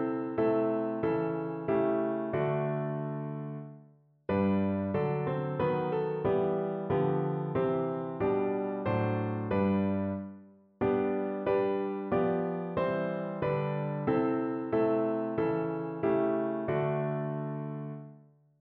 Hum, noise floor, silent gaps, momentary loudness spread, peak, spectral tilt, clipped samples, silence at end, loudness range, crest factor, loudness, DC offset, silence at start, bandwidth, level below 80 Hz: none; -60 dBFS; none; 7 LU; -16 dBFS; -8 dB/octave; under 0.1%; 0.4 s; 2 LU; 14 dB; -31 LUFS; under 0.1%; 0 s; 4.5 kHz; -62 dBFS